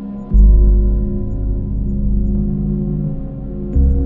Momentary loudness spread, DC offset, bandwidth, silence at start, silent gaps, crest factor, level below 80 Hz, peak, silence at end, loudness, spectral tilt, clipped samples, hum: 10 LU; under 0.1%; 1.4 kHz; 0 s; none; 14 dB; -14 dBFS; 0 dBFS; 0 s; -18 LUFS; -13.5 dB/octave; under 0.1%; 50 Hz at -20 dBFS